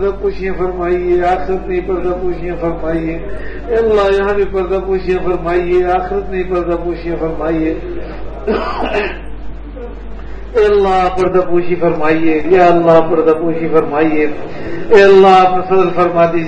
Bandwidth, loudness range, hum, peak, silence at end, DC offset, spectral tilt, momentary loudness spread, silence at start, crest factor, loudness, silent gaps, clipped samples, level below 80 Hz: 8 kHz; 8 LU; none; 0 dBFS; 0 s; under 0.1%; -7.5 dB/octave; 16 LU; 0 s; 12 dB; -13 LUFS; none; 0.2%; -30 dBFS